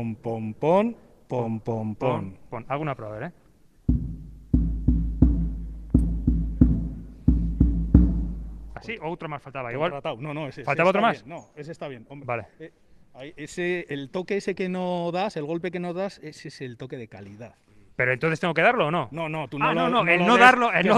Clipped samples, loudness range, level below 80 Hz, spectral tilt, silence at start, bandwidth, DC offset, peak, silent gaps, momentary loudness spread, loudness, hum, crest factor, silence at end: under 0.1%; 7 LU; -32 dBFS; -7 dB/octave; 0 s; 10 kHz; under 0.1%; 0 dBFS; none; 19 LU; -24 LUFS; none; 24 dB; 0 s